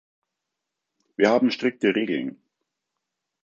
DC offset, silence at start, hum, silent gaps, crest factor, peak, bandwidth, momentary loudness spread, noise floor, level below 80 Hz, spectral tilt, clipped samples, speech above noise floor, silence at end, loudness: under 0.1%; 1.2 s; none; none; 22 dB; -4 dBFS; 7.6 kHz; 13 LU; -83 dBFS; -74 dBFS; -5.5 dB/octave; under 0.1%; 61 dB; 1.1 s; -23 LUFS